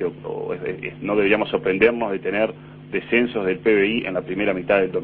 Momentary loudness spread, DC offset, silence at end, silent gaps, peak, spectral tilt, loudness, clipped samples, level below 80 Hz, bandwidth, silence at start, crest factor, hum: 11 LU; under 0.1%; 0 s; none; 0 dBFS; -9.5 dB/octave; -21 LUFS; under 0.1%; -52 dBFS; 4.4 kHz; 0 s; 20 dB; none